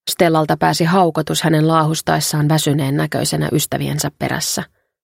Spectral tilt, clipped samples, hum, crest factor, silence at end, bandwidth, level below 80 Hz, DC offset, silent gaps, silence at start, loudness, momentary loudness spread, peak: -4.5 dB/octave; under 0.1%; none; 16 dB; 0.4 s; 16.5 kHz; -48 dBFS; under 0.1%; none; 0.05 s; -16 LUFS; 6 LU; 0 dBFS